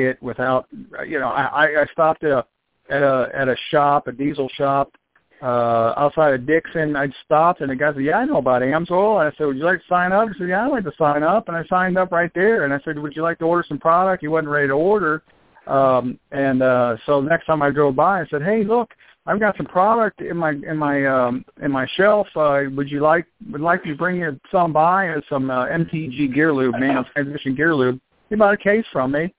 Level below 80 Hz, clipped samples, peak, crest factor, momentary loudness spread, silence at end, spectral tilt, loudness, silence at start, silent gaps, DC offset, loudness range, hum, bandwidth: -54 dBFS; under 0.1%; -2 dBFS; 16 dB; 7 LU; 0.1 s; -10 dB/octave; -19 LUFS; 0 s; none; under 0.1%; 2 LU; none; 4 kHz